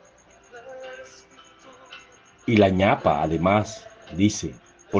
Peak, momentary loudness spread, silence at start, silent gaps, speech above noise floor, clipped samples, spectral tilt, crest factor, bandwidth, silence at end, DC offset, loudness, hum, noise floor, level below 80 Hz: -4 dBFS; 25 LU; 0.55 s; none; 32 dB; under 0.1%; -6 dB/octave; 20 dB; 9.8 kHz; 0 s; under 0.1%; -22 LUFS; none; -54 dBFS; -54 dBFS